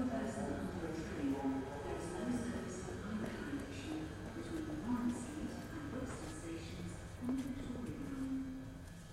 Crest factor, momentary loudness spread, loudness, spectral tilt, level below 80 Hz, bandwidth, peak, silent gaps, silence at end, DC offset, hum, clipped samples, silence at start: 14 dB; 7 LU; -43 LUFS; -6 dB/octave; -56 dBFS; 15.5 kHz; -28 dBFS; none; 0 s; under 0.1%; none; under 0.1%; 0 s